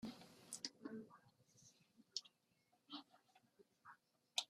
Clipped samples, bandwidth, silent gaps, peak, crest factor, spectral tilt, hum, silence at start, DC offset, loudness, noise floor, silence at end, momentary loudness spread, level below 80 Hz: under 0.1%; 14 kHz; none; -24 dBFS; 32 dB; -1.5 dB/octave; none; 0 s; under 0.1%; -53 LUFS; -82 dBFS; 0.05 s; 18 LU; under -90 dBFS